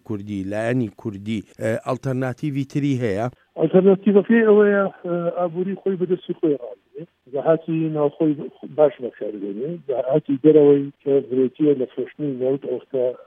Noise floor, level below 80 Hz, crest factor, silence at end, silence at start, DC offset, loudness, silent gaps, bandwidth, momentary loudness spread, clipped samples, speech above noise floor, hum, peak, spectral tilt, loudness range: -40 dBFS; -68 dBFS; 18 dB; 0.1 s; 0.1 s; under 0.1%; -21 LUFS; none; 9.2 kHz; 14 LU; under 0.1%; 20 dB; none; -2 dBFS; -8.5 dB/octave; 5 LU